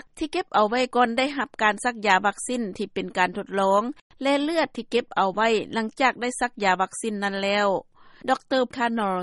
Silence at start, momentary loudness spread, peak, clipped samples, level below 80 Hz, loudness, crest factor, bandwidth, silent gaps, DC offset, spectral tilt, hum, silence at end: 0.15 s; 7 LU; -6 dBFS; under 0.1%; -60 dBFS; -24 LUFS; 18 dB; 11.5 kHz; 4.01-4.10 s; under 0.1%; -4 dB/octave; none; 0 s